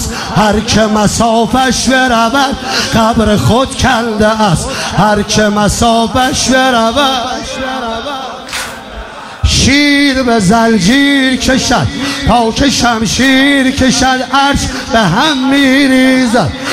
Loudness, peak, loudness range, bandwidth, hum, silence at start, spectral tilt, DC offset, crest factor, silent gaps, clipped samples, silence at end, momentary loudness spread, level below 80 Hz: -10 LUFS; 0 dBFS; 3 LU; 15.5 kHz; none; 0 s; -4 dB/octave; under 0.1%; 10 dB; none; under 0.1%; 0 s; 10 LU; -28 dBFS